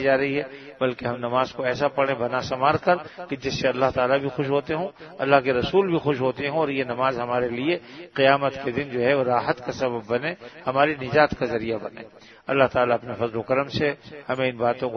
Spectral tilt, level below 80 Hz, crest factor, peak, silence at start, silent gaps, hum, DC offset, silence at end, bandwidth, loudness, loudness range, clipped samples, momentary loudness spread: -6 dB/octave; -56 dBFS; 22 dB; 0 dBFS; 0 s; none; none; under 0.1%; 0 s; 6.6 kHz; -24 LUFS; 2 LU; under 0.1%; 9 LU